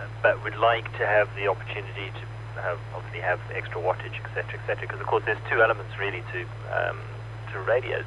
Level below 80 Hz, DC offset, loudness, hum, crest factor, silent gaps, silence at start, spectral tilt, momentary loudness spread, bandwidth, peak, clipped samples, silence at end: -50 dBFS; under 0.1%; -27 LUFS; none; 20 dB; none; 0 s; -6.5 dB/octave; 12 LU; 10.5 kHz; -6 dBFS; under 0.1%; 0 s